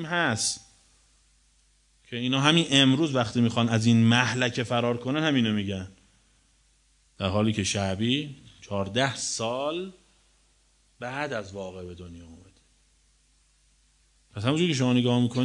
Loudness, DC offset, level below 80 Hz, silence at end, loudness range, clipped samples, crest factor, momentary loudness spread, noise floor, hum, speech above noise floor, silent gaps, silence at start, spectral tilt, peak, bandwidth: -25 LUFS; under 0.1%; -62 dBFS; 0 s; 16 LU; under 0.1%; 22 dB; 19 LU; -64 dBFS; none; 39 dB; none; 0 s; -4.5 dB/octave; -4 dBFS; 11 kHz